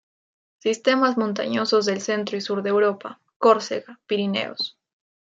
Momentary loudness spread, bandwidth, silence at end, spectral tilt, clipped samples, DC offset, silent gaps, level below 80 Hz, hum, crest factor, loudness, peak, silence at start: 11 LU; 7.8 kHz; 0.55 s; -4.5 dB/octave; under 0.1%; under 0.1%; 3.36-3.40 s; -74 dBFS; none; 20 dB; -23 LUFS; -4 dBFS; 0.65 s